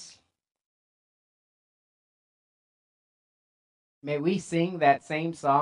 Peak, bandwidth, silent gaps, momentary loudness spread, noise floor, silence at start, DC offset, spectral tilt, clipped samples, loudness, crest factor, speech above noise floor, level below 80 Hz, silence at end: -8 dBFS; 11 kHz; 0.66-4.01 s; 9 LU; -55 dBFS; 0 s; under 0.1%; -6 dB/octave; under 0.1%; -27 LUFS; 22 dB; 29 dB; -76 dBFS; 0 s